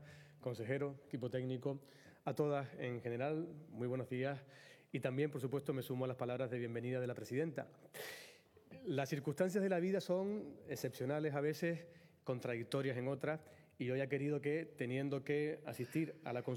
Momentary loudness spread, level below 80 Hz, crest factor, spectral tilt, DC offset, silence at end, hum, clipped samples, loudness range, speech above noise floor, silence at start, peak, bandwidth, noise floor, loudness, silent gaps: 11 LU; -88 dBFS; 18 dB; -7 dB/octave; under 0.1%; 0 s; none; under 0.1%; 3 LU; 21 dB; 0 s; -24 dBFS; 18.5 kHz; -62 dBFS; -42 LUFS; none